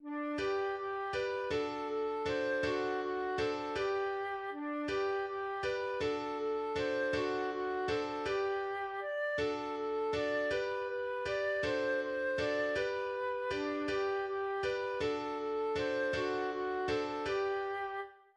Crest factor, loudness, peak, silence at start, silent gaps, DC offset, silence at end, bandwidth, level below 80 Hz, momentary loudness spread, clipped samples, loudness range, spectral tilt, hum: 12 dB; -36 LUFS; -22 dBFS; 0 s; none; under 0.1%; 0.2 s; 10 kHz; -62 dBFS; 4 LU; under 0.1%; 1 LU; -5 dB/octave; none